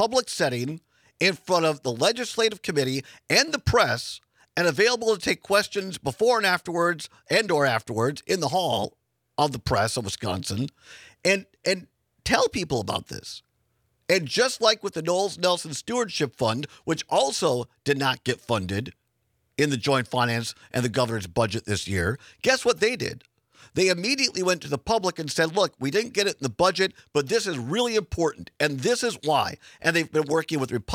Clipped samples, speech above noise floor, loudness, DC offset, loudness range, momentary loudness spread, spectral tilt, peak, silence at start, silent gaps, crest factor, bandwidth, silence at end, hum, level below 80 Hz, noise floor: under 0.1%; 48 dB; -25 LUFS; under 0.1%; 3 LU; 9 LU; -4 dB/octave; -4 dBFS; 0 s; none; 22 dB; 16.5 kHz; 0 s; none; -54 dBFS; -72 dBFS